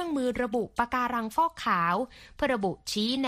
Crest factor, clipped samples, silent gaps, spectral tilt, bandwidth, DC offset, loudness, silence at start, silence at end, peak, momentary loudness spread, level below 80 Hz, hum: 18 dB; under 0.1%; none; -4.5 dB/octave; 15.5 kHz; under 0.1%; -29 LUFS; 0 s; 0 s; -10 dBFS; 5 LU; -54 dBFS; none